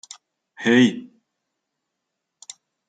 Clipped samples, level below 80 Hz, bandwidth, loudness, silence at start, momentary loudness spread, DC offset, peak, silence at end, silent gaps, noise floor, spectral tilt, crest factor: under 0.1%; -72 dBFS; 9.2 kHz; -18 LUFS; 0.6 s; 25 LU; under 0.1%; -6 dBFS; 1.85 s; none; -80 dBFS; -5 dB/octave; 20 dB